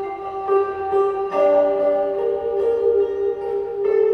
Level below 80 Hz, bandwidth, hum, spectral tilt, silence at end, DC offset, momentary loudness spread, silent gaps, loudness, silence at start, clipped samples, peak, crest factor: -56 dBFS; 5.2 kHz; none; -7 dB/octave; 0 s; under 0.1%; 7 LU; none; -20 LUFS; 0 s; under 0.1%; -6 dBFS; 12 dB